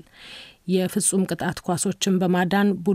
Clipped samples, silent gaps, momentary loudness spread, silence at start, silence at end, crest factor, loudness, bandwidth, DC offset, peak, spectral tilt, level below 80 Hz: under 0.1%; none; 18 LU; 0.2 s; 0 s; 16 dB; -22 LUFS; 16 kHz; under 0.1%; -8 dBFS; -4.5 dB/octave; -56 dBFS